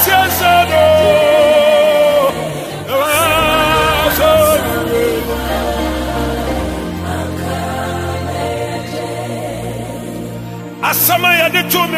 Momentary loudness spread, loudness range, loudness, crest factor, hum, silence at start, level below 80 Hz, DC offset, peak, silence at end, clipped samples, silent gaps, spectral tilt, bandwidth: 13 LU; 9 LU; -13 LUFS; 14 dB; none; 0 s; -30 dBFS; under 0.1%; 0 dBFS; 0 s; under 0.1%; none; -4 dB/octave; 15.5 kHz